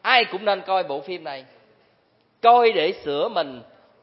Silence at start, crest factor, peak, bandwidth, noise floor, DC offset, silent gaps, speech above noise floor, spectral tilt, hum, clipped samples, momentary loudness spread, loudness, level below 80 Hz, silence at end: 0.05 s; 22 dB; 0 dBFS; 5.8 kHz; -63 dBFS; under 0.1%; none; 42 dB; -7.5 dB/octave; none; under 0.1%; 16 LU; -21 LUFS; -72 dBFS; 0.4 s